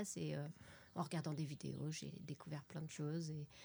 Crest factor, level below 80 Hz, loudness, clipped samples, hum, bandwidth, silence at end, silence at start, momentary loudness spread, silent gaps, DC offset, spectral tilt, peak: 16 dB; -78 dBFS; -47 LUFS; under 0.1%; none; over 20 kHz; 0 s; 0 s; 8 LU; none; under 0.1%; -5.5 dB/octave; -30 dBFS